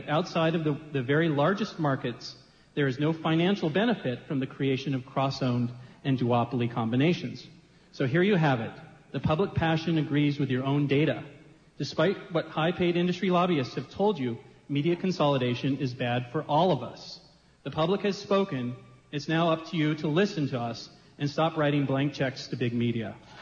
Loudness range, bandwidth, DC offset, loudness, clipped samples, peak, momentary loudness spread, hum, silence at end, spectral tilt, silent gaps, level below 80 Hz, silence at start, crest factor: 2 LU; 7.4 kHz; under 0.1%; -28 LUFS; under 0.1%; -12 dBFS; 11 LU; none; 0 s; -7 dB/octave; none; -60 dBFS; 0 s; 16 dB